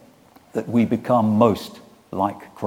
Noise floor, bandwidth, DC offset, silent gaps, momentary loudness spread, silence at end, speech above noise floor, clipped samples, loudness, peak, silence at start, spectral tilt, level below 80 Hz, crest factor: -51 dBFS; 16 kHz; under 0.1%; none; 14 LU; 0 s; 31 dB; under 0.1%; -21 LUFS; -2 dBFS; 0.55 s; -8 dB/octave; -60 dBFS; 18 dB